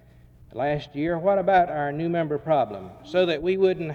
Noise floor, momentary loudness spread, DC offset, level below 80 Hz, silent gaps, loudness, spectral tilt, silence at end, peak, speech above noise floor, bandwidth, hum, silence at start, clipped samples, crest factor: -51 dBFS; 9 LU; under 0.1%; -54 dBFS; none; -24 LUFS; -7.5 dB/octave; 0 s; -8 dBFS; 28 dB; 7 kHz; none; 0.55 s; under 0.1%; 16 dB